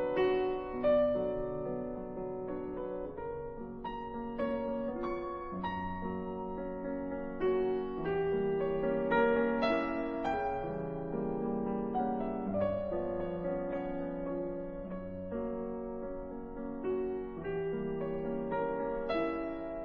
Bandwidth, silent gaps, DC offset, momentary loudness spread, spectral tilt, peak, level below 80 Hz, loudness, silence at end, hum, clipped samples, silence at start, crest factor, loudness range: 5.8 kHz; none; under 0.1%; 10 LU; -6 dB/octave; -16 dBFS; -52 dBFS; -35 LUFS; 0 s; none; under 0.1%; 0 s; 18 dB; 7 LU